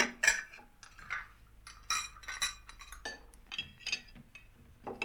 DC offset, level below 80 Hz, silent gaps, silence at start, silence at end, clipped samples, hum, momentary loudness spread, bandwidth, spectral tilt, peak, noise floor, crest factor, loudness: under 0.1%; -60 dBFS; none; 0 s; 0 s; under 0.1%; none; 24 LU; over 20 kHz; 0 dB/octave; -12 dBFS; -58 dBFS; 28 dB; -36 LUFS